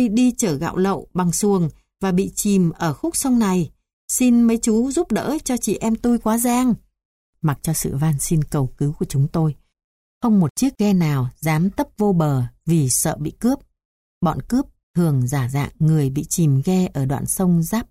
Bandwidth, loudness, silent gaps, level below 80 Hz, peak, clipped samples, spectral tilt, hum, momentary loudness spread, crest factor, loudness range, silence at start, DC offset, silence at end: 16 kHz; -20 LUFS; 3.93-4.08 s, 7.05-7.33 s, 9.84-10.21 s, 10.50-10.56 s, 13.85-14.21 s, 14.83-14.94 s; -44 dBFS; -6 dBFS; under 0.1%; -6 dB/octave; none; 6 LU; 12 dB; 2 LU; 0 s; under 0.1%; 0.05 s